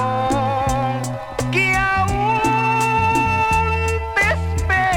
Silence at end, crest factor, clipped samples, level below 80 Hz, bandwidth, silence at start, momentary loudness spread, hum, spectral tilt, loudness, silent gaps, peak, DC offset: 0 s; 14 dB; under 0.1%; -30 dBFS; 17.5 kHz; 0 s; 5 LU; none; -5 dB/octave; -18 LUFS; none; -4 dBFS; under 0.1%